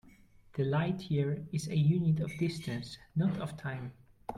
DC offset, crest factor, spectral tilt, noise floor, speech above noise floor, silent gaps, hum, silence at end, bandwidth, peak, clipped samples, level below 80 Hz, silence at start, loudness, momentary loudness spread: under 0.1%; 16 dB; -7.5 dB/octave; -59 dBFS; 27 dB; none; none; 0 s; 12 kHz; -18 dBFS; under 0.1%; -62 dBFS; 0.55 s; -33 LUFS; 13 LU